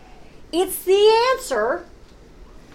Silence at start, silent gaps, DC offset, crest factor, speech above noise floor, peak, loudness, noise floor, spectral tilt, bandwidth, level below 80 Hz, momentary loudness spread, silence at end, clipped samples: 0.2 s; none; under 0.1%; 16 dB; 26 dB; -6 dBFS; -19 LUFS; -44 dBFS; -2.5 dB/octave; 16.5 kHz; -48 dBFS; 11 LU; 0.3 s; under 0.1%